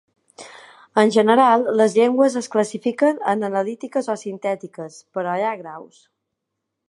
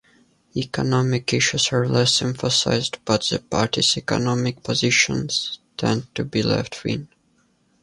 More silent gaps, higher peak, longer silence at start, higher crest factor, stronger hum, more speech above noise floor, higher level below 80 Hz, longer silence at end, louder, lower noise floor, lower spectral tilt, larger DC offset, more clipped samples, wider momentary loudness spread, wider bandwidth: neither; about the same, -2 dBFS vs -4 dBFS; second, 0.4 s vs 0.55 s; about the same, 20 dB vs 18 dB; neither; first, 60 dB vs 42 dB; second, -76 dBFS vs -50 dBFS; first, 1.05 s vs 0.75 s; about the same, -19 LUFS vs -21 LUFS; first, -79 dBFS vs -63 dBFS; about the same, -5 dB/octave vs -4 dB/octave; neither; neither; first, 19 LU vs 9 LU; about the same, 11.5 kHz vs 11.5 kHz